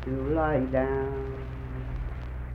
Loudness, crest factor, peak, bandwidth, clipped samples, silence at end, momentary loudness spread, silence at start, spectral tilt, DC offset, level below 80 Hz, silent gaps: -30 LUFS; 16 dB; -12 dBFS; 5.2 kHz; under 0.1%; 0 s; 11 LU; 0 s; -10 dB/octave; under 0.1%; -36 dBFS; none